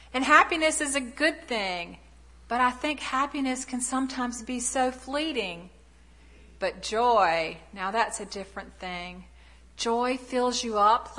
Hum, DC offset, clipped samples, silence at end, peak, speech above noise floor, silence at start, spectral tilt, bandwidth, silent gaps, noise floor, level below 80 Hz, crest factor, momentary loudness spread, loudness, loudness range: none; under 0.1%; under 0.1%; 0 s; -4 dBFS; 27 dB; 0 s; -2 dB/octave; 11.5 kHz; none; -54 dBFS; -54 dBFS; 24 dB; 14 LU; -27 LUFS; 3 LU